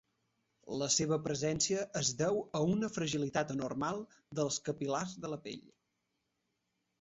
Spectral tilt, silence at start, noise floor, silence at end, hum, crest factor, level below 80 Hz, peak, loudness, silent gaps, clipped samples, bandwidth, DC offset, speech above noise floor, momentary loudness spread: -4.5 dB/octave; 0.65 s; -83 dBFS; 1.4 s; none; 18 dB; -68 dBFS; -18 dBFS; -35 LUFS; none; under 0.1%; 8 kHz; under 0.1%; 48 dB; 12 LU